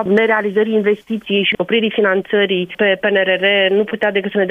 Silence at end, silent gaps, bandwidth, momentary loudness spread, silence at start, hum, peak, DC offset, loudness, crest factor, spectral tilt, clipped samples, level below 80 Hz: 0 s; none; 4.2 kHz; 4 LU; 0 s; none; -2 dBFS; under 0.1%; -15 LUFS; 12 dB; -7 dB/octave; under 0.1%; -60 dBFS